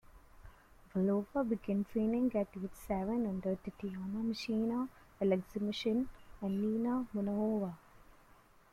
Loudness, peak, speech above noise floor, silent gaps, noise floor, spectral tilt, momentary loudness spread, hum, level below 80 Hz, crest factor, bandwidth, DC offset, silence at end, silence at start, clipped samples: -36 LUFS; -20 dBFS; 28 dB; none; -63 dBFS; -7.5 dB/octave; 9 LU; none; -60 dBFS; 16 dB; 14 kHz; under 0.1%; 0.7 s; 0.15 s; under 0.1%